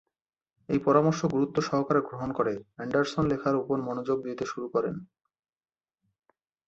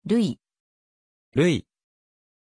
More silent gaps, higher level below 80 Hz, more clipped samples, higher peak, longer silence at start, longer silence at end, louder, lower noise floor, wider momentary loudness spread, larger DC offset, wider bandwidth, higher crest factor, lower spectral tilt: second, none vs 0.60-1.32 s; about the same, -60 dBFS vs -58 dBFS; neither; about the same, -10 dBFS vs -10 dBFS; first, 0.7 s vs 0.05 s; first, 1.6 s vs 0.95 s; second, -28 LUFS vs -24 LUFS; second, -80 dBFS vs under -90 dBFS; about the same, 10 LU vs 9 LU; neither; second, 8 kHz vs 10.5 kHz; about the same, 20 dB vs 18 dB; about the same, -7 dB/octave vs -6.5 dB/octave